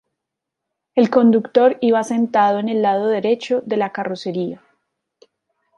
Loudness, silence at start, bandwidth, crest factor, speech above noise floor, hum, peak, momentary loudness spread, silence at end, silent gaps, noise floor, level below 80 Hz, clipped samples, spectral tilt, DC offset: -18 LUFS; 0.95 s; 11.5 kHz; 16 dB; 65 dB; none; -2 dBFS; 10 LU; 1.2 s; none; -82 dBFS; -68 dBFS; under 0.1%; -6.5 dB/octave; under 0.1%